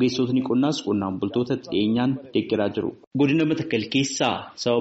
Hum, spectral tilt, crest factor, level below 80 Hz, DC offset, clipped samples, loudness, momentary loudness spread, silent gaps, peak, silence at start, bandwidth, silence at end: none; -5 dB/octave; 16 dB; -60 dBFS; under 0.1%; under 0.1%; -24 LUFS; 5 LU; 3.07-3.11 s; -8 dBFS; 0 s; 8 kHz; 0 s